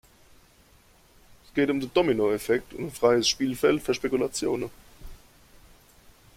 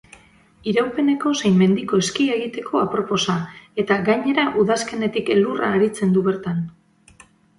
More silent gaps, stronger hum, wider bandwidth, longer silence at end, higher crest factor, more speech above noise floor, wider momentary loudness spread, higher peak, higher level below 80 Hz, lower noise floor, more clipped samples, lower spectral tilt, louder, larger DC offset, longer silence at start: neither; neither; first, 16.5 kHz vs 11.5 kHz; first, 1.2 s vs 0.9 s; first, 20 dB vs 14 dB; about the same, 33 dB vs 32 dB; about the same, 9 LU vs 8 LU; about the same, -8 dBFS vs -6 dBFS; about the same, -54 dBFS vs -58 dBFS; first, -58 dBFS vs -51 dBFS; neither; second, -4 dB/octave vs -5.5 dB/octave; second, -25 LUFS vs -20 LUFS; neither; first, 1.55 s vs 0.65 s